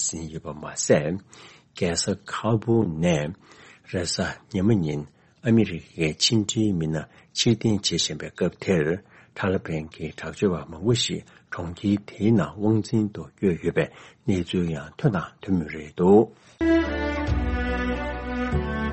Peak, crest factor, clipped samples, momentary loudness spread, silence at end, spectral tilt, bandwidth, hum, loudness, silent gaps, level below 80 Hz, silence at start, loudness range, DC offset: -6 dBFS; 18 dB; under 0.1%; 12 LU; 0 s; -5 dB/octave; 8.8 kHz; none; -25 LUFS; none; -40 dBFS; 0 s; 3 LU; under 0.1%